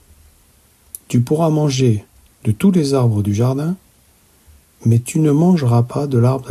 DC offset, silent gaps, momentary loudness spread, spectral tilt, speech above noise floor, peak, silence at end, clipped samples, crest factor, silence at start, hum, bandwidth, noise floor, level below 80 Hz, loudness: under 0.1%; none; 10 LU; -7.5 dB/octave; 38 dB; -2 dBFS; 0 s; under 0.1%; 14 dB; 1.1 s; none; 14 kHz; -53 dBFS; -52 dBFS; -16 LUFS